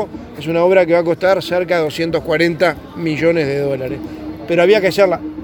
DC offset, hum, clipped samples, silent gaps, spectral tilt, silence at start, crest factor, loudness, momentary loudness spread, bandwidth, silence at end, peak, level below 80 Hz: under 0.1%; none; under 0.1%; none; -6 dB/octave; 0 s; 16 dB; -15 LUFS; 13 LU; 19 kHz; 0 s; 0 dBFS; -46 dBFS